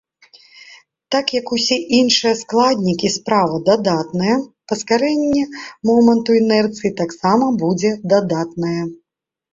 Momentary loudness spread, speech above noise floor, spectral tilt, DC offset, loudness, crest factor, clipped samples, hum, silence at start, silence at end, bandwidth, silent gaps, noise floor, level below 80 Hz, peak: 8 LU; 33 dB; -4.5 dB/octave; under 0.1%; -17 LUFS; 16 dB; under 0.1%; none; 0.7 s; 0.6 s; 7.8 kHz; none; -49 dBFS; -56 dBFS; -2 dBFS